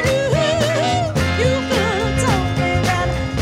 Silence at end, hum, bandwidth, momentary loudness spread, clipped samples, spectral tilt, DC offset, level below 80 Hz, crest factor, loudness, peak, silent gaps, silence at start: 0 s; none; 16 kHz; 2 LU; under 0.1%; -5 dB/octave; under 0.1%; -30 dBFS; 14 dB; -18 LUFS; -4 dBFS; none; 0 s